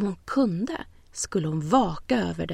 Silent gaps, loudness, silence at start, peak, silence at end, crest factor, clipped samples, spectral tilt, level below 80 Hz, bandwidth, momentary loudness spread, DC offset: none; -26 LUFS; 0 s; -8 dBFS; 0 s; 18 dB; under 0.1%; -5.5 dB/octave; -48 dBFS; 13.5 kHz; 10 LU; under 0.1%